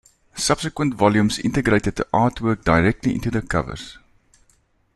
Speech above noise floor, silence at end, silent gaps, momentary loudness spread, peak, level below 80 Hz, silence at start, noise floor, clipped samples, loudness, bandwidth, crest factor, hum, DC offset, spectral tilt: 42 dB; 1.05 s; none; 8 LU; -2 dBFS; -40 dBFS; 0.35 s; -61 dBFS; under 0.1%; -20 LUFS; 12.5 kHz; 20 dB; none; under 0.1%; -5.5 dB/octave